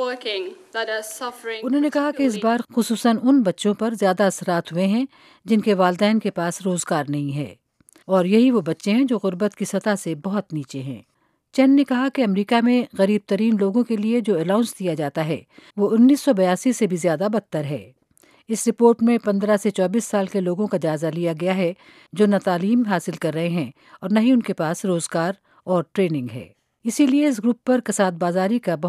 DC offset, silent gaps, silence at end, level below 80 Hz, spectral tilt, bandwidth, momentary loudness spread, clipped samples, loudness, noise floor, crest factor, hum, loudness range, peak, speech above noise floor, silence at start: under 0.1%; none; 0 s; -72 dBFS; -5.5 dB/octave; 14.5 kHz; 11 LU; under 0.1%; -21 LUFS; -57 dBFS; 18 dB; none; 2 LU; -2 dBFS; 36 dB; 0 s